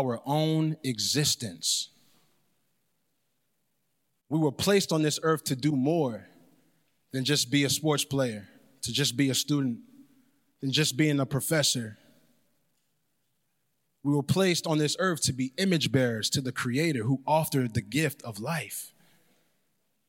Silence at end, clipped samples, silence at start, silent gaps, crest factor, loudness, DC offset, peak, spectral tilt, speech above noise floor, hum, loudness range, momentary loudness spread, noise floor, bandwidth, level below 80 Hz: 1.2 s; under 0.1%; 0 s; none; 18 dB; -27 LUFS; under 0.1%; -12 dBFS; -4 dB/octave; 51 dB; none; 4 LU; 8 LU; -78 dBFS; 16.5 kHz; -66 dBFS